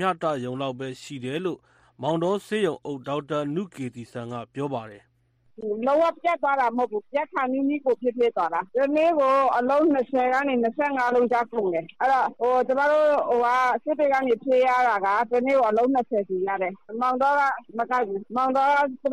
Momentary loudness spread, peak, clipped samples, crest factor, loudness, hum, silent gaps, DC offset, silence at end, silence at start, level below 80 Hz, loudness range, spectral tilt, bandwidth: 11 LU; -10 dBFS; under 0.1%; 14 dB; -24 LUFS; none; none; under 0.1%; 0 s; 0 s; -68 dBFS; 7 LU; -6 dB/octave; 11.5 kHz